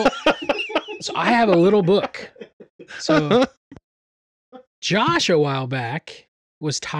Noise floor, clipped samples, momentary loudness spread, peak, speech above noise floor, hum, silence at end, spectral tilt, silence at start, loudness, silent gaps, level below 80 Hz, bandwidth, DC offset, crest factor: under -90 dBFS; under 0.1%; 15 LU; -4 dBFS; over 71 dB; none; 0 s; -5 dB/octave; 0 s; -20 LUFS; 2.53-2.60 s, 2.70-2.79 s, 3.57-3.71 s, 3.84-4.52 s, 4.67-4.82 s, 6.28-6.61 s; -54 dBFS; 11.5 kHz; under 0.1%; 18 dB